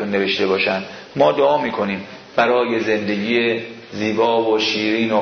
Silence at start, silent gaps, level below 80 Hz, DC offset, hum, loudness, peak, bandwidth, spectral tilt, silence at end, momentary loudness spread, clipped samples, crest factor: 0 s; none; -60 dBFS; under 0.1%; none; -18 LUFS; -2 dBFS; 6.6 kHz; -5 dB/octave; 0 s; 8 LU; under 0.1%; 16 dB